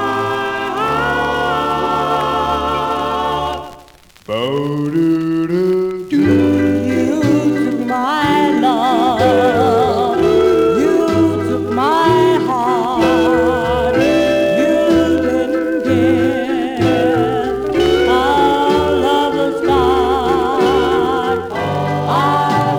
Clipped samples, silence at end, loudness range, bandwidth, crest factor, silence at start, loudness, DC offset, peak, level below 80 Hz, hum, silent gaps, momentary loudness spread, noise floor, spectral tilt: under 0.1%; 0 s; 5 LU; 18 kHz; 12 dB; 0 s; -14 LUFS; under 0.1%; -2 dBFS; -40 dBFS; none; none; 5 LU; -43 dBFS; -6 dB/octave